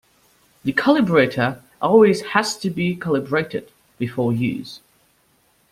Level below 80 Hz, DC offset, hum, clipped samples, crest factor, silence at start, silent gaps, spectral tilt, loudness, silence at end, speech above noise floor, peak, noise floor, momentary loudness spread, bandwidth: -58 dBFS; under 0.1%; none; under 0.1%; 18 dB; 0.65 s; none; -6 dB/octave; -19 LUFS; 0.95 s; 42 dB; -2 dBFS; -61 dBFS; 15 LU; 15.5 kHz